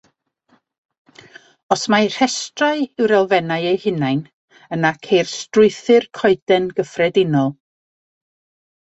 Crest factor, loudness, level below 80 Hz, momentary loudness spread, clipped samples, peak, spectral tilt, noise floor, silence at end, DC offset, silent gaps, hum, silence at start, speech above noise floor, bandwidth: 18 dB; -17 LUFS; -60 dBFS; 6 LU; under 0.1%; -2 dBFS; -5 dB/octave; -61 dBFS; 1.35 s; under 0.1%; 4.33-4.48 s, 6.42-6.47 s; none; 1.7 s; 44 dB; 8.2 kHz